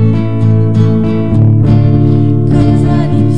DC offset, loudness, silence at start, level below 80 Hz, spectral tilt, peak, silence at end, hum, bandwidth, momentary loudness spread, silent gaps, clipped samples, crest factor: 9%; -9 LUFS; 0 s; -28 dBFS; -10 dB/octave; 0 dBFS; 0 s; none; 5.2 kHz; 3 LU; none; 0.8%; 8 dB